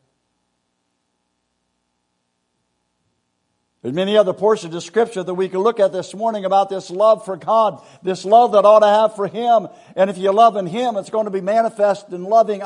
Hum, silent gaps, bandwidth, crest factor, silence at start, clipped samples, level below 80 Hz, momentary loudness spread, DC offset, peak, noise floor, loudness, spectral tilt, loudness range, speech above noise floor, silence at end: 60 Hz at -55 dBFS; none; 10.5 kHz; 18 dB; 3.85 s; under 0.1%; -74 dBFS; 11 LU; under 0.1%; 0 dBFS; -71 dBFS; -17 LUFS; -5.5 dB/octave; 7 LU; 55 dB; 0 s